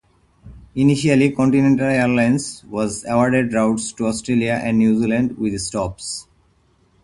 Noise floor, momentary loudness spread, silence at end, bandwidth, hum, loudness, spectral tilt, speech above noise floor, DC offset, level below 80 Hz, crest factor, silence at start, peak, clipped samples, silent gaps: -58 dBFS; 9 LU; 0.8 s; 11.5 kHz; none; -18 LUFS; -6 dB/octave; 41 dB; under 0.1%; -48 dBFS; 18 dB; 0.45 s; -2 dBFS; under 0.1%; none